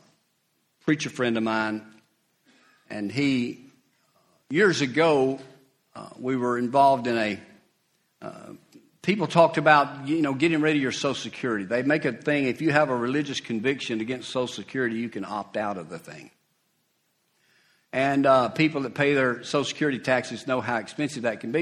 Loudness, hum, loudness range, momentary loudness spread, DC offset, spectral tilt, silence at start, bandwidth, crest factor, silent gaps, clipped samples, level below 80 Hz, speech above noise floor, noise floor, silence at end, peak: -25 LUFS; none; 7 LU; 15 LU; under 0.1%; -5.5 dB/octave; 0.85 s; 12 kHz; 22 dB; none; under 0.1%; -68 dBFS; 47 dB; -71 dBFS; 0 s; -4 dBFS